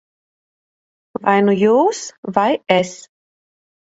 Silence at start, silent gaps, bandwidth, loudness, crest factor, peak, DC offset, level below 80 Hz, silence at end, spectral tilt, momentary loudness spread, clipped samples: 1.2 s; 2.18-2.23 s; 8 kHz; -16 LUFS; 18 dB; 0 dBFS; under 0.1%; -64 dBFS; 0.95 s; -5 dB/octave; 13 LU; under 0.1%